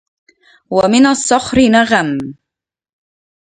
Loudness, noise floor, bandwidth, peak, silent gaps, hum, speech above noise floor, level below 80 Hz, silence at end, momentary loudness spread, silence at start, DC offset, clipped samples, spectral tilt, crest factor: -12 LUFS; -84 dBFS; 9.6 kHz; 0 dBFS; none; none; 72 dB; -44 dBFS; 1.1 s; 10 LU; 0.7 s; under 0.1%; under 0.1%; -4 dB/octave; 14 dB